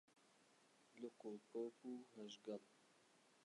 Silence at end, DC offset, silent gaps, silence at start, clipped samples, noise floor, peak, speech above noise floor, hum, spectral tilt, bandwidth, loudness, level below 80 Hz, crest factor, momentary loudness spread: 0 s; under 0.1%; none; 0.1 s; under 0.1%; -75 dBFS; -38 dBFS; 21 dB; none; -5 dB/octave; 11 kHz; -55 LUFS; under -90 dBFS; 18 dB; 7 LU